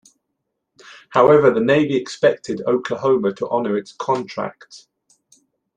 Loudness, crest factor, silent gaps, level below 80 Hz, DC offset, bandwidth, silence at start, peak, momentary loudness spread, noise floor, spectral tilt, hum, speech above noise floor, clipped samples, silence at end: -18 LUFS; 18 dB; none; -62 dBFS; under 0.1%; 9.4 kHz; 0.9 s; -2 dBFS; 11 LU; -76 dBFS; -6 dB/octave; none; 59 dB; under 0.1%; 1 s